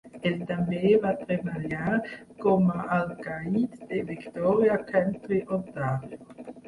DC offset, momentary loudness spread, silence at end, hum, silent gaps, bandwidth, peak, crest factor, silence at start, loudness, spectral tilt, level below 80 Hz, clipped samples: under 0.1%; 11 LU; 0 s; none; none; 11 kHz; -10 dBFS; 16 dB; 0.05 s; -27 LUFS; -8.5 dB/octave; -60 dBFS; under 0.1%